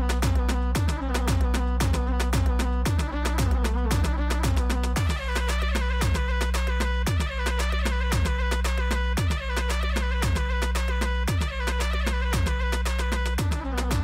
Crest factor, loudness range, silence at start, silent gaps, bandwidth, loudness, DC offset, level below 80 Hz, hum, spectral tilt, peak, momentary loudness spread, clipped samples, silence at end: 8 dB; 1 LU; 0 s; none; 16 kHz; -26 LUFS; under 0.1%; -26 dBFS; none; -5 dB/octave; -14 dBFS; 2 LU; under 0.1%; 0 s